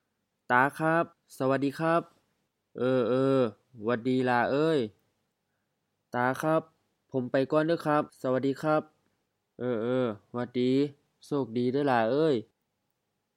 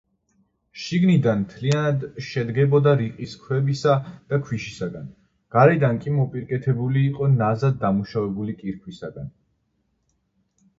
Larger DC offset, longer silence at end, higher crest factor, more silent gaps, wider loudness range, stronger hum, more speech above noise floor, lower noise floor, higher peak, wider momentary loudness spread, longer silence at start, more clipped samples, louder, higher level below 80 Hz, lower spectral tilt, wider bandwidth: neither; second, 0.95 s vs 1.5 s; about the same, 22 dB vs 22 dB; neither; about the same, 3 LU vs 3 LU; neither; first, 53 dB vs 49 dB; first, -80 dBFS vs -70 dBFS; second, -8 dBFS vs -2 dBFS; second, 9 LU vs 17 LU; second, 0.5 s vs 0.75 s; neither; second, -28 LUFS vs -22 LUFS; second, -78 dBFS vs -56 dBFS; about the same, -7 dB/octave vs -8 dB/octave; first, 15 kHz vs 7.6 kHz